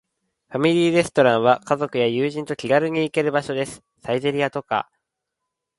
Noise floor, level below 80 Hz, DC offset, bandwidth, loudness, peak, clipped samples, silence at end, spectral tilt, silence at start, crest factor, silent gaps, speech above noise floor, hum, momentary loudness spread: -81 dBFS; -62 dBFS; under 0.1%; 11.5 kHz; -21 LUFS; -2 dBFS; under 0.1%; 0.95 s; -5.5 dB/octave; 0.5 s; 20 dB; none; 61 dB; none; 10 LU